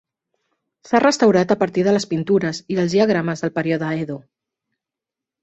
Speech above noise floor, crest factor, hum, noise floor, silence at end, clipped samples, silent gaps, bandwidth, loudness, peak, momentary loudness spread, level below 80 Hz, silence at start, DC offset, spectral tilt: 69 dB; 18 dB; none; -87 dBFS; 1.25 s; under 0.1%; none; 8.2 kHz; -19 LUFS; -2 dBFS; 9 LU; -60 dBFS; 0.85 s; under 0.1%; -6 dB/octave